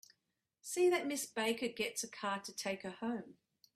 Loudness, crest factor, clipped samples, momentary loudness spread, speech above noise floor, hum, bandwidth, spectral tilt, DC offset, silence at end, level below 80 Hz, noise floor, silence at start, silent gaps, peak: -38 LUFS; 16 dB; under 0.1%; 11 LU; 48 dB; none; 15.5 kHz; -3 dB/octave; under 0.1%; 0.45 s; -82 dBFS; -86 dBFS; 0.65 s; none; -22 dBFS